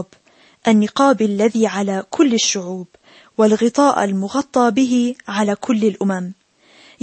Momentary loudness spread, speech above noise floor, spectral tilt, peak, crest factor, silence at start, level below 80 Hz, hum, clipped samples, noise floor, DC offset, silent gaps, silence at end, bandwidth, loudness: 9 LU; 36 dB; -4.5 dB/octave; -2 dBFS; 16 dB; 0 s; -64 dBFS; none; under 0.1%; -52 dBFS; under 0.1%; none; 0.7 s; 8.8 kHz; -17 LUFS